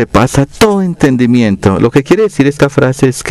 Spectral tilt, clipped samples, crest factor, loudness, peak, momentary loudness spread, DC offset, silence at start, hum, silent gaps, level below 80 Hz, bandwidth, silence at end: -6.5 dB/octave; 0.1%; 10 dB; -10 LUFS; 0 dBFS; 2 LU; under 0.1%; 0 s; none; none; -32 dBFS; 16 kHz; 0 s